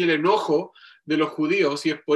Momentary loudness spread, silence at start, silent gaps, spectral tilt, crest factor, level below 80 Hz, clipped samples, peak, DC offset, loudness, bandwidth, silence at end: 6 LU; 0 s; none; -5.5 dB/octave; 14 dB; -72 dBFS; under 0.1%; -8 dBFS; under 0.1%; -22 LUFS; 12 kHz; 0 s